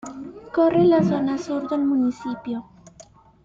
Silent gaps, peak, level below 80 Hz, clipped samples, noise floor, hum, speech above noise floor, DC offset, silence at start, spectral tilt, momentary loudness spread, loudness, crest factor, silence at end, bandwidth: none; -8 dBFS; -58 dBFS; under 0.1%; -50 dBFS; none; 30 dB; under 0.1%; 0.05 s; -7.5 dB/octave; 15 LU; -21 LUFS; 14 dB; 0.45 s; 7.6 kHz